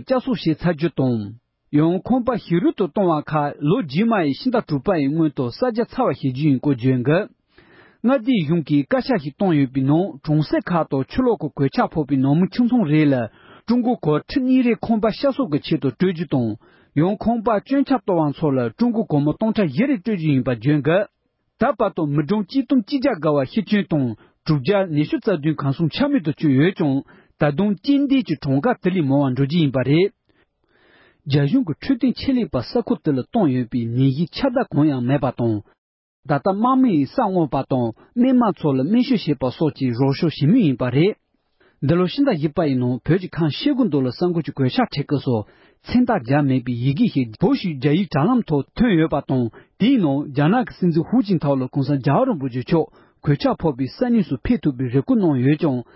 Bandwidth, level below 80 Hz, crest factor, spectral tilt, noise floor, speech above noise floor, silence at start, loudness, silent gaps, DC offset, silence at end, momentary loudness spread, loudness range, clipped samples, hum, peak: 5.8 kHz; -48 dBFS; 14 dB; -12 dB/octave; -63 dBFS; 44 dB; 0 s; -20 LUFS; 35.78-36.23 s; under 0.1%; 0.15 s; 5 LU; 2 LU; under 0.1%; none; -6 dBFS